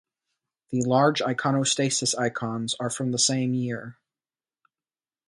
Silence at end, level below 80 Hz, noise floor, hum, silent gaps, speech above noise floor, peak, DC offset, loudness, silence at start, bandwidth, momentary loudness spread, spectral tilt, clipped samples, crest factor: 1.35 s; -68 dBFS; under -90 dBFS; none; none; over 65 dB; -8 dBFS; under 0.1%; -24 LUFS; 0.7 s; 11.5 kHz; 10 LU; -4 dB/octave; under 0.1%; 18 dB